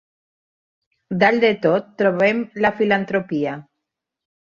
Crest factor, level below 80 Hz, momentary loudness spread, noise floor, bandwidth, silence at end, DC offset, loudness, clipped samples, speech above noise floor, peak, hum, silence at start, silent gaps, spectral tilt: 18 dB; -62 dBFS; 9 LU; -81 dBFS; 7.2 kHz; 0.9 s; under 0.1%; -19 LUFS; under 0.1%; 63 dB; -2 dBFS; none; 1.1 s; none; -7 dB/octave